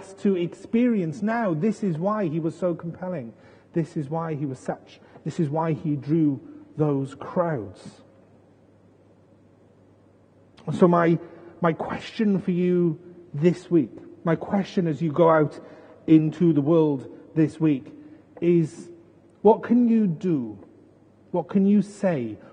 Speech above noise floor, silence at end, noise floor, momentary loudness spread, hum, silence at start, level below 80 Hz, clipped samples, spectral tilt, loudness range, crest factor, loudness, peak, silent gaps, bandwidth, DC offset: 33 dB; 0.15 s; -56 dBFS; 14 LU; none; 0 s; -66 dBFS; under 0.1%; -8.5 dB/octave; 8 LU; 20 dB; -24 LUFS; -4 dBFS; none; 9.6 kHz; under 0.1%